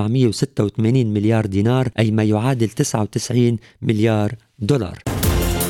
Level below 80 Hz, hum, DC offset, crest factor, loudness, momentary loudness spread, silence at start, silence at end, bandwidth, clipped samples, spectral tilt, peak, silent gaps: -34 dBFS; none; under 0.1%; 14 dB; -19 LUFS; 4 LU; 0 s; 0 s; 18 kHz; under 0.1%; -6.5 dB/octave; -4 dBFS; none